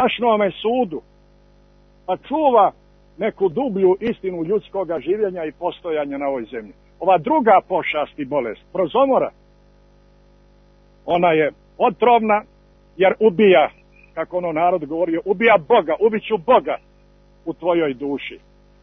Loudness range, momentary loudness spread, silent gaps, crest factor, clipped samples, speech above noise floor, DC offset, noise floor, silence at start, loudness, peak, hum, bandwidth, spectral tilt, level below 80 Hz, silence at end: 5 LU; 12 LU; none; 16 dB; under 0.1%; 34 dB; under 0.1%; -52 dBFS; 0 s; -19 LUFS; -2 dBFS; 50 Hz at -55 dBFS; 4.1 kHz; -8.5 dB/octave; -54 dBFS; 0.45 s